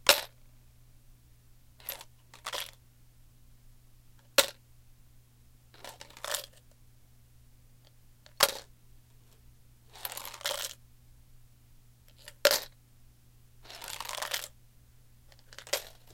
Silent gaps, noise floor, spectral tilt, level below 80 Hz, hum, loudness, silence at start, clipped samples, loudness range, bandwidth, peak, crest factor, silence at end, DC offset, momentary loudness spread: none; -59 dBFS; 0 dB/octave; -60 dBFS; none; -32 LUFS; 0.05 s; under 0.1%; 10 LU; 17 kHz; 0 dBFS; 38 dB; 0 s; under 0.1%; 23 LU